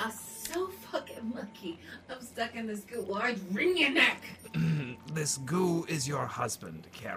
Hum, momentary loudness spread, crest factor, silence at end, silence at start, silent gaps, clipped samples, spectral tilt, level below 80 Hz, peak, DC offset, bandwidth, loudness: none; 17 LU; 22 dB; 0 s; 0 s; none; under 0.1%; -4 dB/octave; -66 dBFS; -10 dBFS; under 0.1%; 15.5 kHz; -32 LUFS